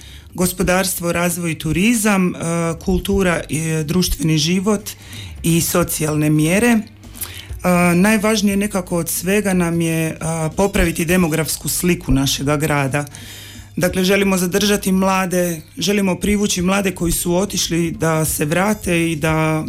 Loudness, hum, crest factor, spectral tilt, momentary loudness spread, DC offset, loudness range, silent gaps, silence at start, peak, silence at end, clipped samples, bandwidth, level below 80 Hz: -17 LUFS; none; 12 dB; -4.5 dB/octave; 7 LU; under 0.1%; 2 LU; none; 0 s; -6 dBFS; 0 s; under 0.1%; 16.5 kHz; -34 dBFS